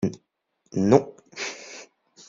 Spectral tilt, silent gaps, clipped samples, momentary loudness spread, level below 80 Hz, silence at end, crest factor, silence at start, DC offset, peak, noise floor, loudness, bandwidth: -6 dB/octave; none; under 0.1%; 21 LU; -60 dBFS; 0.45 s; 24 dB; 0 s; under 0.1%; -2 dBFS; -72 dBFS; -24 LUFS; 7.6 kHz